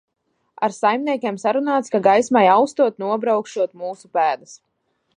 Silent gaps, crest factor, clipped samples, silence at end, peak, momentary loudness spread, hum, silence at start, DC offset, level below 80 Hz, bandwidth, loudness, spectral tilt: none; 18 dB; under 0.1%; 0.6 s; -2 dBFS; 10 LU; none; 0.6 s; under 0.1%; -70 dBFS; 10.5 kHz; -19 LUFS; -5 dB/octave